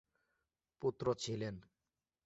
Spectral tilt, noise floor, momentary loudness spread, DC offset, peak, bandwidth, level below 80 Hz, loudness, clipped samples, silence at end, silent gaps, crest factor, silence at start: -5.5 dB/octave; under -90 dBFS; 8 LU; under 0.1%; -22 dBFS; 8 kHz; -70 dBFS; -40 LUFS; under 0.1%; 0.65 s; none; 20 dB; 0.8 s